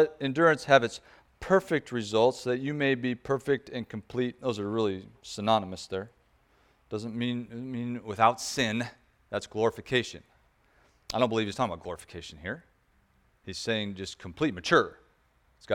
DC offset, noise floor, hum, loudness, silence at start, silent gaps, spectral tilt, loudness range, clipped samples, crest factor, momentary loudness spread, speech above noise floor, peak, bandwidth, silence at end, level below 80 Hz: under 0.1%; -67 dBFS; none; -29 LUFS; 0 s; none; -5 dB/octave; 7 LU; under 0.1%; 24 dB; 15 LU; 38 dB; -6 dBFS; 17 kHz; 0 s; -60 dBFS